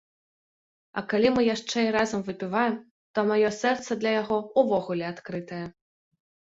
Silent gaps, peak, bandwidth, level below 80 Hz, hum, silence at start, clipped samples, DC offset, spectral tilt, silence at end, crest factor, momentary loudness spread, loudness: 2.91-3.14 s; -8 dBFS; 8 kHz; -64 dBFS; none; 0.95 s; under 0.1%; under 0.1%; -5 dB/octave; 0.9 s; 18 dB; 13 LU; -26 LUFS